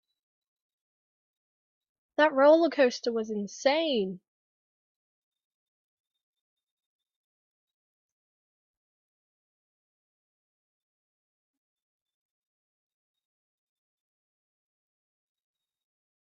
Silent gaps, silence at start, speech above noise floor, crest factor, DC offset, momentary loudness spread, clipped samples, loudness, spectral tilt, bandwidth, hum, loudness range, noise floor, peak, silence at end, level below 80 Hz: none; 2.2 s; over 65 dB; 26 dB; under 0.1%; 13 LU; under 0.1%; -25 LUFS; -2.5 dB/octave; 6.8 kHz; none; 7 LU; under -90 dBFS; -8 dBFS; 12.05 s; -84 dBFS